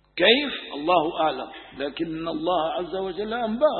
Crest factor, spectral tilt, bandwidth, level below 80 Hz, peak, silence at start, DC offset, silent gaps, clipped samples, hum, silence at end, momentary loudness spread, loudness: 22 dB; -9 dB/octave; 4.4 kHz; -56 dBFS; -2 dBFS; 0.15 s; under 0.1%; none; under 0.1%; none; 0 s; 13 LU; -24 LUFS